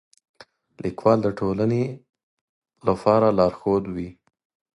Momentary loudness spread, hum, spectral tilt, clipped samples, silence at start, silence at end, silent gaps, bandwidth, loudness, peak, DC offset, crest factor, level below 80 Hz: 14 LU; none; -8.5 dB/octave; under 0.1%; 0.85 s; 0.65 s; 2.23-2.62 s; 11 kHz; -22 LUFS; -4 dBFS; under 0.1%; 20 dB; -52 dBFS